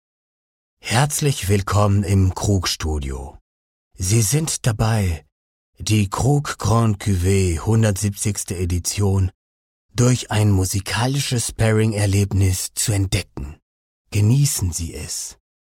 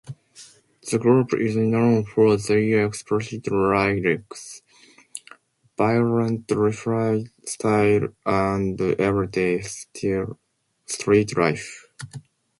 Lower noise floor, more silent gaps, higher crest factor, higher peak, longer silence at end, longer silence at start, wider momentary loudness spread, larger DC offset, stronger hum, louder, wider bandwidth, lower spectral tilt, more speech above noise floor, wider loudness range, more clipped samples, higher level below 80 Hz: first, under -90 dBFS vs -54 dBFS; first, 3.41-3.91 s, 5.32-5.73 s, 9.35-9.89 s, 13.62-14.05 s vs none; about the same, 16 dB vs 16 dB; about the same, -4 dBFS vs -6 dBFS; about the same, 0.4 s vs 0.4 s; first, 0.85 s vs 0.05 s; second, 9 LU vs 20 LU; neither; neither; about the same, -20 LUFS vs -22 LUFS; first, 16.5 kHz vs 11.5 kHz; about the same, -5 dB/octave vs -6 dB/octave; first, over 71 dB vs 32 dB; about the same, 2 LU vs 4 LU; neither; first, -38 dBFS vs -52 dBFS